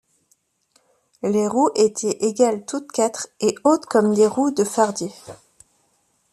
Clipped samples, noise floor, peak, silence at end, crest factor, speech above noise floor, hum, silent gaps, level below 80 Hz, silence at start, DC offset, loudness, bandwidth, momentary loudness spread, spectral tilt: under 0.1%; -65 dBFS; -4 dBFS; 0.95 s; 18 dB; 46 dB; none; none; -66 dBFS; 1.25 s; under 0.1%; -20 LUFS; 13.5 kHz; 10 LU; -4.5 dB/octave